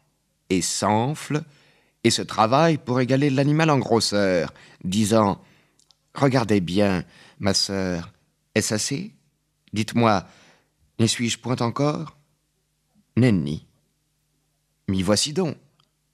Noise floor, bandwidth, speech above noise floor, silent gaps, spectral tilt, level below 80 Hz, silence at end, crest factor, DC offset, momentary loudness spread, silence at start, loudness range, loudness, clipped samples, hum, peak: -71 dBFS; 14.5 kHz; 49 dB; none; -5 dB/octave; -58 dBFS; 0.6 s; 22 dB; under 0.1%; 13 LU; 0.5 s; 5 LU; -22 LUFS; under 0.1%; none; -2 dBFS